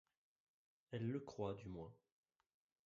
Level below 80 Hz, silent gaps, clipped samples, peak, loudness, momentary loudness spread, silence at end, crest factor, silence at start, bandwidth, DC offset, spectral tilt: -74 dBFS; none; under 0.1%; -30 dBFS; -49 LUFS; 9 LU; 0.9 s; 20 dB; 0.9 s; 7.4 kHz; under 0.1%; -7.5 dB/octave